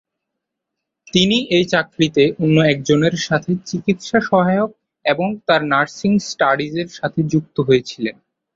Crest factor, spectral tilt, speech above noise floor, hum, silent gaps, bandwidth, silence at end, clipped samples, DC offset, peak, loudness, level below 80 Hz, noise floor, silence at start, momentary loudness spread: 16 dB; -5.5 dB/octave; 63 dB; none; none; 7.8 kHz; 0.45 s; under 0.1%; under 0.1%; -2 dBFS; -17 LUFS; -54 dBFS; -80 dBFS; 1.15 s; 8 LU